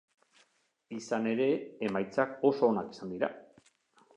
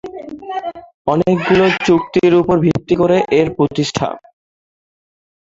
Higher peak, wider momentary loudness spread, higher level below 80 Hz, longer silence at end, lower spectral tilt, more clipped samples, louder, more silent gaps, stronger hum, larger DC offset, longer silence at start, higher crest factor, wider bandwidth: second, -14 dBFS vs 0 dBFS; about the same, 14 LU vs 13 LU; second, -76 dBFS vs -46 dBFS; second, 0.75 s vs 1.3 s; about the same, -6 dB/octave vs -6.5 dB/octave; neither; second, -31 LUFS vs -15 LUFS; second, none vs 0.94-1.05 s; neither; neither; first, 0.9 s vs 0.05 s; about the same, 20 dB vs 16 dB; first, 10 kHz vs 7.8 kHz